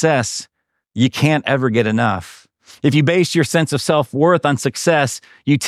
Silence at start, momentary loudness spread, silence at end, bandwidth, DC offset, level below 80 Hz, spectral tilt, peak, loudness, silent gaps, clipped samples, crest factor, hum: 0 s; 8 LU; 0 s; 14.5 kHz; under 0.1%; -58 dBFS; -5 dB/octave; -2 dBFS; -17 LUFS; none; under 0.1%; 16 dB; none